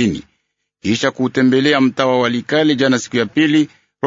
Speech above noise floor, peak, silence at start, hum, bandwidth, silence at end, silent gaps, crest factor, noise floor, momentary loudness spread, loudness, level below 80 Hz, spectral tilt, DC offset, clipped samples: 54 dB; 0 dBFS; 0 s; none; 7.8 kHz; 0.4 s; none; 16 dB; -69 dBFS; 7 LU; -15 LUFS; -54 dBFS; -5 dB/octave; under 0.1%; under 0.1%